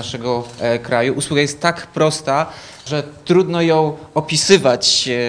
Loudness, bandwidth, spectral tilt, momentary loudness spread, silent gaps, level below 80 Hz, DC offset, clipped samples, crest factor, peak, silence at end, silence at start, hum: -16 LUFS; 10.5 kHz; -4 dB/octave; 11 LU; none; -52 dBFS; under 0.1%; under 0.1%; 16 dB; 0 dBFS; 0 s; 0 s; none